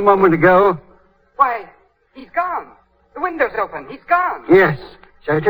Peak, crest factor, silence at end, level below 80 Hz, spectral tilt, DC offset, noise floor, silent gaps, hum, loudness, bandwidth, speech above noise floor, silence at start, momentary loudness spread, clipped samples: 0 dBFS; 16 dB; 0 s; -48 dBFS; -9 dB/octave; under 0.1%; -52 dBFS; none; none; -16 LUFS; over 20 kHz; 36 dB; 0 s; 16 LU; under 0.1%